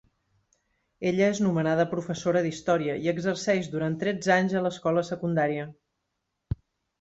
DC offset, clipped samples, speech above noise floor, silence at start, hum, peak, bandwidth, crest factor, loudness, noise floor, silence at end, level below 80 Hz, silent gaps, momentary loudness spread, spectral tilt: under 0.1%; under 0.1%; 55 dB; 1 s; none; -10 dBFS; 8 kHz; 18 dB; -26 LUFS; -81 dBFS; 0.45 s; -54 dBFS; none; 10 LU; -6 dB/octave